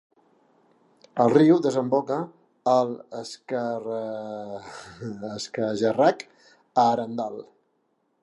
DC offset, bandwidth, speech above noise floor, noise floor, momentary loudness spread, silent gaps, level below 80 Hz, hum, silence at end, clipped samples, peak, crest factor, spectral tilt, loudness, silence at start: under 0.1%; 11 kHz; 47 dB; -71 dBFS; 18 LU; none; -72 dBFS; none; 0.8 s; under 0.1%; -6 dBFS; 20 dB; -6.5 dB/octave; -24 LUFS; 1.15 s